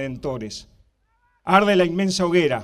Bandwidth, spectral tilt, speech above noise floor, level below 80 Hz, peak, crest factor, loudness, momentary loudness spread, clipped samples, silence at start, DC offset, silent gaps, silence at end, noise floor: 13.5 kHz; -5 dB/octave; 45 dB; -52 dBFS; -2 dBFS; 20 dB; -20 LUFS; 18 LU; under 0.1%; 0 s; under 0.1%; none; 0 s; -65 dBFS